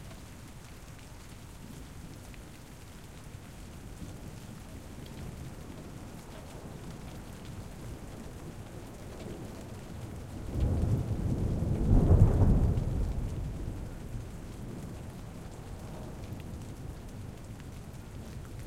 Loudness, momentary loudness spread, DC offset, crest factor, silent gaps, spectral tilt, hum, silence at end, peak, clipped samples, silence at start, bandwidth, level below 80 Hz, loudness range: -35 LUFS; 19 LU; 0.1%; 26 dB; none; -7.5 dB/octave; none; 0 s; -8 dBFS; under 0.1%; 0 s; 16 kHz; -38 dBFS; 18 LU